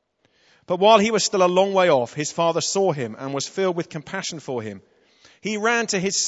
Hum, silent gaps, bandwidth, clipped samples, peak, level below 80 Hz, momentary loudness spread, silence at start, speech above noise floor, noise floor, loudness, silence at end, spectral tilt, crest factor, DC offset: none; none; 8.2 kHz; under 0.1%; 0 dBFS; -68 dBFS; 14 LU; 0.7 s; 41 dB; -62 dBFS; -21 LUFS; 0 s; -3.5 dB/octave; 22 dB; under 0.1%